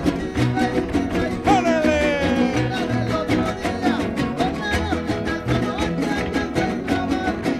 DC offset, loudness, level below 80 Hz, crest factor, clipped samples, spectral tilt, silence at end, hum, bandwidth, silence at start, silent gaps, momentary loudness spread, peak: under 0.1%; -21 LUFS; -36 dBFS; 16 dB; under 0.1%; -6 dB/octave; 0 s; none; 14 kHz; 0 s; none; 5 LU; -4 dBFS